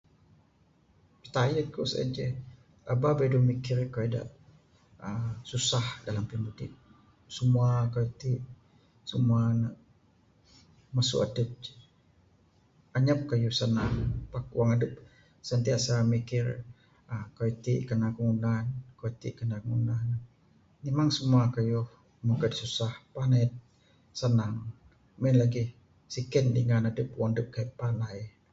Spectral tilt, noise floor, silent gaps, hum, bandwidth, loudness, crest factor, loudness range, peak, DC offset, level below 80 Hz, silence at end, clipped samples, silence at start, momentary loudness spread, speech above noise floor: -6.5 dB/octave; -65 dBFS; none; none; 7.8 kHz; -30 LUFS; 20 dB; 3 LU; -10 dBFS; under 0.1%; -54 dBFS; 0.25 s; under 0.1%; 1.25 s; 14 LU; 37 dB